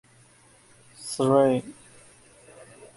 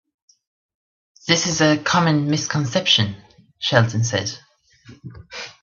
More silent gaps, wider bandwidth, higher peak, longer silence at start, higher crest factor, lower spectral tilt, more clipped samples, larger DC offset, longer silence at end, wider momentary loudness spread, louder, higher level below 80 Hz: neither; first, 11.5 kHz vs 7.6 kHz; second, -8 dBFS vs 0 dBFS; second, 1 s vs 1.25 s; about the same, 22 dB vs 22 dB; first, -6 dB/octave vs -4 dB/octave; neither; neither; first, 0.35 s vs 0.15 s; first, 25 LU vs 20 LU; second, -23 LUFS vs -19 LUFS; second, -66 dBFS vs -58 dBFS